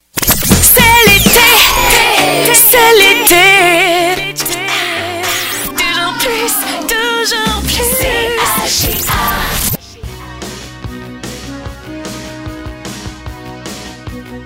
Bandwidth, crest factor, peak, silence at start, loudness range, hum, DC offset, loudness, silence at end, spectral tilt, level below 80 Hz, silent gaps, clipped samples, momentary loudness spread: over 20 kHz; 12 dB; 0 dBFS; 0.15 s; 20 LU; none; under 0.1%; -8 LUFS; 0 s; -2 dB/octave; -28 dBFS; none; 0.5%; 22 LU